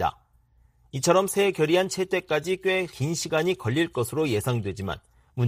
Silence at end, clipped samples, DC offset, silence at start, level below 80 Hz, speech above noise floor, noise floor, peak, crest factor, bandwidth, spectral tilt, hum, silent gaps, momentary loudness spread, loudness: 0 s; under 0.1%; under 0.1%; 0 s; -56 dBFS; 36 dB; -61 dBFS; -6 dBFS; 20 dB; 15.5 kHz; -5 dB/octave; none; none; 11 LU; -25 LUFS